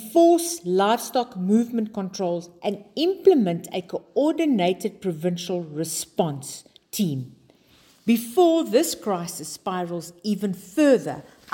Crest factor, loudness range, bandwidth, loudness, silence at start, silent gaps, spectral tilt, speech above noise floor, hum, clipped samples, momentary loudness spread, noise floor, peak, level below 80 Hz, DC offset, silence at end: 18 dB; 4 LU; 17 kHz; -23 LUFS; 0 s; none; -5 dB/octave; 34 dB; none; under 0.1%; 13 LU; -57 dBFS; -6 dBFS; -68 dBFS; under 0.1%; 0.3 s